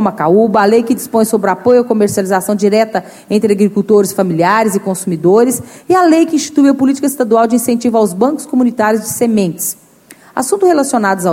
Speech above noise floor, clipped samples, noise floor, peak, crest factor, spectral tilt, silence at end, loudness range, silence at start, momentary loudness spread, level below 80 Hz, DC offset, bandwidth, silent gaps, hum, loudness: 30 dB; under 0.1%; -41 dBFS; 0 dBFS; 12 dB; -5.5 dB/octave; 0 s; 2 LU; 0 s; 7 LU; -56 dBFS; under 0.1%; 16.5 kHz; none; none; -12 LUFS